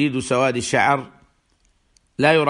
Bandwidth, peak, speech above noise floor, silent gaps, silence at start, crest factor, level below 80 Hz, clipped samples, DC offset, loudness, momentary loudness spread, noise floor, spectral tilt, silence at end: 11.5 kHz; -2 dBFS; 44 dB; none; 0 s; 18 dB; -56 dBFS; under 0.1%; under 0.1%; -19 LUFS; 16 LU; -63 dBFS; -4.5 dB/octave; 0 s